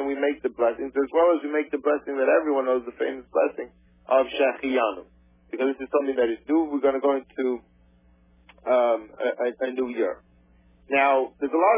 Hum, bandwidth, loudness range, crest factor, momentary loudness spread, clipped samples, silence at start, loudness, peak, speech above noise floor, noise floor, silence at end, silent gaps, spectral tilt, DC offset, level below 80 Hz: none; 3.7 kHz; 3 LU; 16 dB; 8 LU; under 0.1%; 0 s; -24 LUFS; -8 dBFS; 34 dB; -58 dBFS; 0 s; none; -8 dB/octave; under 0.1%; -62 dBFS